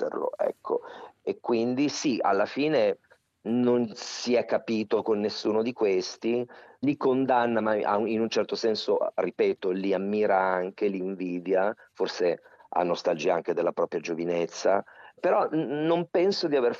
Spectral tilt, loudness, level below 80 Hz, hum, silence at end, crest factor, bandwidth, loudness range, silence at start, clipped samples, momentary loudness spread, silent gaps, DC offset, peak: -5 dB/octave; -27 LUFS; -76 dBFS; none; 0 s; 16 dB; 7.8 kHz; 2 LU; 0 s; under 0.1%; 8 LU; none; under 0.1%; -10 dBFS